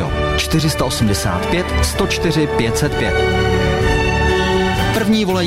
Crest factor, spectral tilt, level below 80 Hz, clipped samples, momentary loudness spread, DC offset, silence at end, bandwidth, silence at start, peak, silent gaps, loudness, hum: 12 dB; -5 dB/octave; -24 dBFS; under 0.1%; 2 LU; under 0.1%; 0 s; 16 kHz; 0 s; -4 dBFS; none; -16 LUFS; none